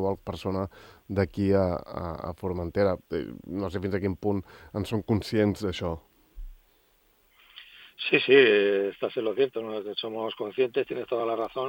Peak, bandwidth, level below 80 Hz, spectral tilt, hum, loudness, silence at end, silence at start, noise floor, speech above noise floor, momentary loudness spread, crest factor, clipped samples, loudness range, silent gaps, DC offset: -6 dBFS; 16.5 kHz; -54 dBFS; -6.5 dB/octave; none; -27 LUFS; 0 s; 0 s; -65 dBFS; 38 dB; 12 LU; 22 dB; under 0.1%; 7 LU; none; under 0.1%